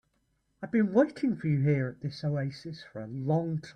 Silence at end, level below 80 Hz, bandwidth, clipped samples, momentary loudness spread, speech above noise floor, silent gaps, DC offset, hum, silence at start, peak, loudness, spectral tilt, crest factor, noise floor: 0.05 s; -66 dBFS; 9.4 kHz; under 0.1%; 16 LU; 45 dB; none; under 0.1%; none; 0.6 s; -12 dBFS; -29 LUFS; -9 dB/octave; 18 dB; -74 dBFS